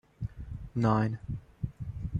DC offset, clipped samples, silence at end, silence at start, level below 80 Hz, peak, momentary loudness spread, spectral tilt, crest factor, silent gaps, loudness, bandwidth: under 0.1%; under 0.1%; 0 s; 0.2 s; -46 dBFS; -12 dBFS; 14 LU; -9 dB/octave; 20 dB; none; -33 LUFS; 7.4 kHz